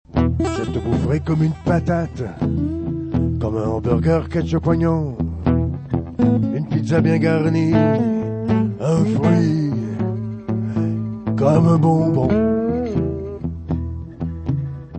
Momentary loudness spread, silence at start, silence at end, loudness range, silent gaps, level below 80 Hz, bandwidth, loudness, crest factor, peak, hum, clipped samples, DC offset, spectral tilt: 9 LU; 0.1 s; 0 s; 3 LU; none; -36 dBFS; 8.6 kHz; -19 LUFS; 16 dB; -2 dBFS; none; under 0.1%; under 0.1%; -9 dB/octave